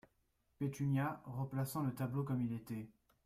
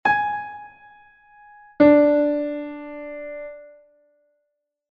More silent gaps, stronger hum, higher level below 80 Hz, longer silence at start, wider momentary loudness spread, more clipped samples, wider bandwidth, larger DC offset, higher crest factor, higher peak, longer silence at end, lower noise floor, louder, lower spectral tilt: neither; neither; second, -70 dBFS vs -58 dBFS; first, 0.6 s vs 0.05 s; second, 9 LU vs 22 LU; neither; first, 15.5 kHz vs 5.2 kHz; neither; second, 14 dB vs 20 dB; second, -26 dBFS vs -4 dBFS; second, 0.35 s vs 1.25 s; about the same, -79 dBFS vs -77 dBFS; second, -41 LUFS vs -19 LUFS; about the same, -7.5 dB/octave vs -8 dB/octave